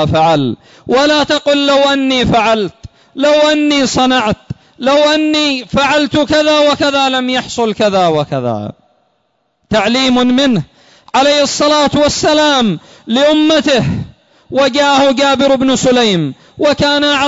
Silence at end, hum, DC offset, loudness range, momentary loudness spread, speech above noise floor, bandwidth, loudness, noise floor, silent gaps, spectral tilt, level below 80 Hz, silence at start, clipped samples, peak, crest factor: 0 s; none; under 0.1%; 3 LU; 9 LU; 51 dB; 8 kHz; -11 LUFS; -62 dBFS; none; -4 dB/octave; -42 dBFS; 0 s; under 0.1%; -2 dBFS; 10 dB